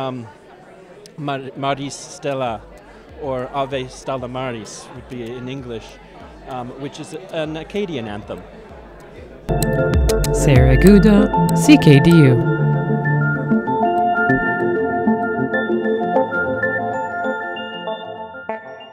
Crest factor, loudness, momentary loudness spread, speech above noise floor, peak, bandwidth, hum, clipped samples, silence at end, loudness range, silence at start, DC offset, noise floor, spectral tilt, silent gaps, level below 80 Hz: 18 dB; -17 LUFS; 20 LU; 26 dB; 0 dBFS; 16 kHz; none; under 0.1%; 0.05 s; 16 LU; 0 s; under 0.1%; -42 dBFS; -6.5 dB/octave; none; -30 dBFS